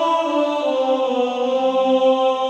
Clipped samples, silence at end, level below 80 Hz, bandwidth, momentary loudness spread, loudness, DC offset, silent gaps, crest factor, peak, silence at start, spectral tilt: under 0.1%; 0 s; -68 dBFS; 8.2 kHz; 4 LU; -18 LUFS; under 0.1%; none; 12 dB; -6 dBFS; 0 s; -4 dB/octave